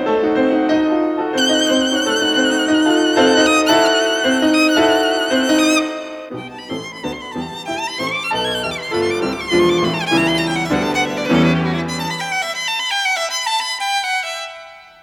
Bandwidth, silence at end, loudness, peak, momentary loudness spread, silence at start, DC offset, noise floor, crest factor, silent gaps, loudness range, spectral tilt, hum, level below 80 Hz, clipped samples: 17.5 kHz; 0.2 s; -16 LUFS; -2 dBFS; 13 LU; 0 s; under 0.1%; -38 dBFS; 16 dB; none; 6 LU; -3.5 dB/octave; none; -50 dBFS; under 0.1%